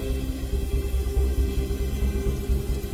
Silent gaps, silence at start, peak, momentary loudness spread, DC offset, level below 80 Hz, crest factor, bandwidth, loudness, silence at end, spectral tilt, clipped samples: none; 0 s; -12 dBFS; 4 LU; under 0.1%; -26 dBFS; 12 dB; 16 kHz; -28 LUFS; 0 s; -6.5 dB/octave; under 0.1%